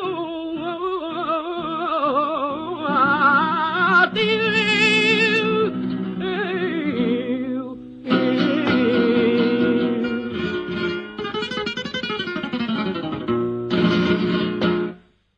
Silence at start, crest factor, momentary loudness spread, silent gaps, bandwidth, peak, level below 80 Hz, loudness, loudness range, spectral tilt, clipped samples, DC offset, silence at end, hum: 0 s; 18 dB; 10 LU; none; 9.4 kHz; -2 dBFS; -56 dBFS; -20 LUFS; 7 LU; -6 dB/octave; under 0.1%; under 0.1%; 0.4 s; none